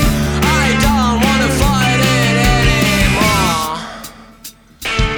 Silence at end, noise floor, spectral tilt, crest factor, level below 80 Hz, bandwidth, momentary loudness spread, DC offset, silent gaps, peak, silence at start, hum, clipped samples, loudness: 0 s; -37 dBFS; -4.5 dB/octave; 14 dB; -22 dBFS; over 20 kHz; 15 LU; under 0.1%; none; 0 dBFS; 0 s; none; under 0.1%; -13 LUFS